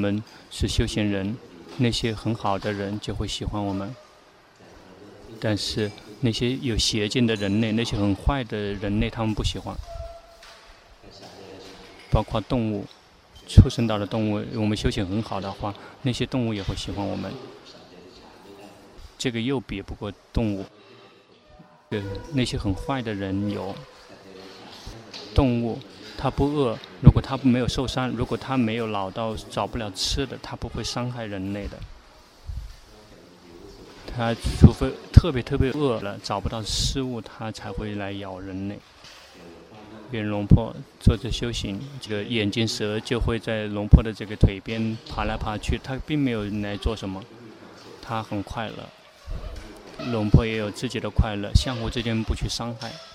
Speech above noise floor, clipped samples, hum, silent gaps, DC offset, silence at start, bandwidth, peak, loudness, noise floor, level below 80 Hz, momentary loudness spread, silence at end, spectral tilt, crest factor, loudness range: 29 dB; under 0.1%; none; none; under 0.1%; 0 s; 14.5 kHz; 0 dBFS; -25 LUFS; -53 dBFS; -34 dBFS; 23 LU; 0 s; -6 dB/octave; 26 dB; 9 LU